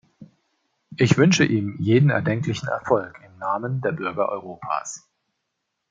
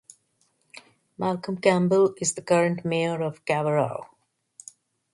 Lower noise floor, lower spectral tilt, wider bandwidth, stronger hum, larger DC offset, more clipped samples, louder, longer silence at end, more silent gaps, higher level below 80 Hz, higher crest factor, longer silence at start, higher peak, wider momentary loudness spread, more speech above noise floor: first, -78 dBFS vs -69 dBFS; about the same, -6 dB/octave vs -5 dB/octave; second, 7.8 kHz vs 11.5 kHz; neither; neither; neither; about the same, -22 LUFS vs -24 LUFS; second, 0.9 s vs 1.1 s; neither; first, -60 dBFS vs -68 dBFS; about the same, 20 dB vs 20 dB; second, 0.2 s vs 0.75 s; first, -2 dBFS vs -6 dBFS; about the same, 15 LU vs 15 LU; first, 57 dB vs 46 dB